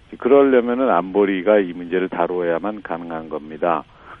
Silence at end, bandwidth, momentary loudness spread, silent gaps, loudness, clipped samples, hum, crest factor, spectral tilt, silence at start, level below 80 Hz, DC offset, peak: 0.05 s; 3.8 kHz; 14 LU; none; -19 LUFS; under 0.1%; none; 18 dB; -9 dB/octave; 0.1 s; -56 dBFS; under 0.1%; -2 dBFS